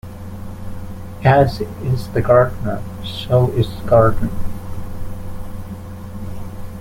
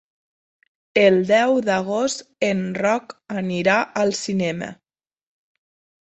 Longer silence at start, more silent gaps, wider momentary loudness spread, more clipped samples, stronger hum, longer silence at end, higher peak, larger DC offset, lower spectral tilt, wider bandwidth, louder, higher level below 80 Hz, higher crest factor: second, 0.05 s vs 0.95 s; neither; first, 19 LU vs 10 LU; neither; neither; second, 0 s vs 1.3 s; about the same, -2 dBFS vs -2 dBFS; neither; first, -7.5 dB/octave vs -5 dB/octave; first, 16.5 kHz vs 8.4 kHz; first, -17 LUFS vs -20 LUFS; first, -32 dBFS vs -62 dBFS; about the same, 16 dB vs 20 dB